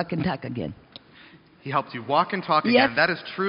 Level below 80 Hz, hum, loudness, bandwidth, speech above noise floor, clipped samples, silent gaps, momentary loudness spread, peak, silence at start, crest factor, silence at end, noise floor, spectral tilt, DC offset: -58 dBFS; none; -23 LUFS; 5.6 kHz; 27 dB; under 0.1%; none; 16 LU; -4 dBFS; 0 s; 20 dB; 0 s; -51 dBFS; -3 dB/octave; under 0.1%